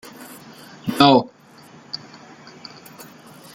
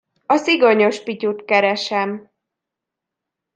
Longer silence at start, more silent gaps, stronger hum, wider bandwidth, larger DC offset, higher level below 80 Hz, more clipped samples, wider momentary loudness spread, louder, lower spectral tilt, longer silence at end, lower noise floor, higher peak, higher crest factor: about the same, 0.2 s vs 0.3 s; neither; neither; first, 17 kHz vs 9.4 kHz; neither; first, -62 dBFS vs -72 dBFS; neither; first, 28 LU vs 10 LU; about the same, -17 LUFS vs -17 LUFS; about the same, -5.5 dB/octave vs -4.5 dB/octave; first, 1.6 s vs 1.35 s; second, -47 dBFS vs -83 dBFS; about the same, -2 dBFS vs -2 dBFS; about the same, 22 dB vs 18 dB